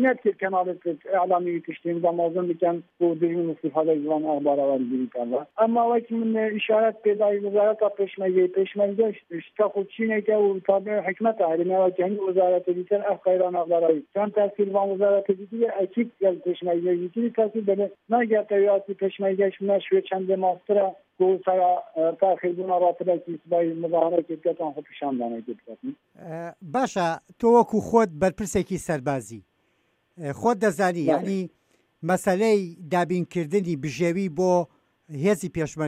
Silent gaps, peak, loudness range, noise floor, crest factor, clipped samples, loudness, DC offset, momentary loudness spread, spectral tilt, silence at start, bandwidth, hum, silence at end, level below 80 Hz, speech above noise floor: none; -6 dBFS; 3 LU; -69 dBFS; 18 dB; under 0.1%; -24 LUFS; under 0.1%; 8 LU; -6.5 dB/octave; 0 s; 14.5 kHz; none; 0 s; -62 dBFS; 45 dB